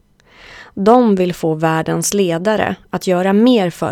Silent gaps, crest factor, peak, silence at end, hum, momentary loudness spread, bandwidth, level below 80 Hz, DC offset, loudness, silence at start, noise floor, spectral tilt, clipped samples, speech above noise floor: none; 14 dB; 0 dBFS; 0 s; none; 7 LU; 17 kHz; -50 dBFS; under 0.1%; -15 LUFS; 0.5 s; -44 dBFS; -5.5 dB/octave; under 0.1%; 30 dB